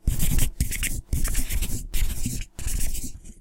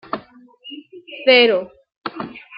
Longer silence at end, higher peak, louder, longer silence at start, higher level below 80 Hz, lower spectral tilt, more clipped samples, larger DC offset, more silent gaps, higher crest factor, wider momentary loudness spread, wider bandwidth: about the same, 0.1 s vs 0 s; second, -6 dBFS vs -2 dBFS; second, -29 LUFS vs -14 LUFS; about the same, 0.05 s vs 0.15 s; first, -26 dBFS vs -66 dBFS; second, -3.5 dB/octave vs -7 dB/octave; neither; neither; second, none vs 1.97-2.02 s; about the same, 16 dB vs 20 dB; second, 6 LU vs 25 LU; first, 17 kHz vs 5.4 kHz